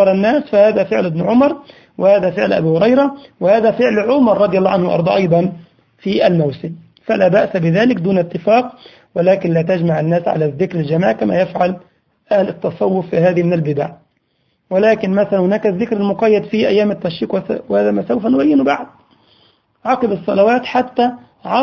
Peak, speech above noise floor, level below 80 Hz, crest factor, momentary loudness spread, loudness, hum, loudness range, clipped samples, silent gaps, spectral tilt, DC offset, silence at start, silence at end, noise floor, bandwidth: 0 dBFS; 49 dB; -52 dBFS; 14 dB; 8 LU; -15 LUFS; none; 3 LU; under 0.1%; none; -8.5 dB/octave; under 0.1%; 0 s; 0 s; -63 dBFS; 6.8 kHz